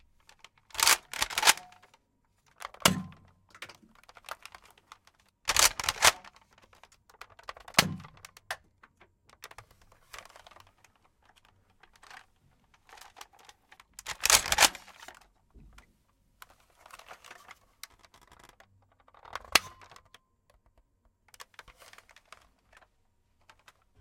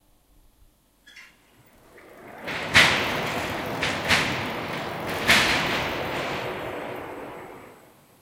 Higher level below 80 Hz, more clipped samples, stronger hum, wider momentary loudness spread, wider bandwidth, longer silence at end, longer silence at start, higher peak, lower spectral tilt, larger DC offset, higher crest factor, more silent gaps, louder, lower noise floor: second, -60 dBFS vs -52 dBFS; neither; neither; first, 28 LU vs 20 LU; about the same, 16.5 kHz vs 17 kHz; first, 4.3 s vs 0.45 s; second, 0.75 s vs 1.05 s; second, -4 dBFS vs 0 dBFS; second, -0.5 dB/octave vs -2.5 dB/octave; neither; about the same, 30 dB vs 26 dB; neither; second, -26 LUFS vs -23 LUFS; first, -73 dBFS vs -59 dBFS